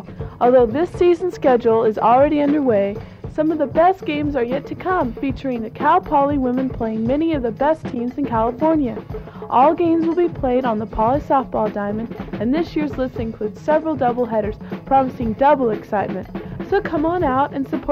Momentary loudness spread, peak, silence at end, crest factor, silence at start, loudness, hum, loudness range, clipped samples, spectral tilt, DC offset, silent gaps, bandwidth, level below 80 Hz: 10 LU; -4 dBFS; 0 s; 14 dB; 0 s; -19 LUFS; none; 4 LU; under 0.1%; -8.5 dB/octave; under 0.1%; none; 7.8 kHz; -40 dBFS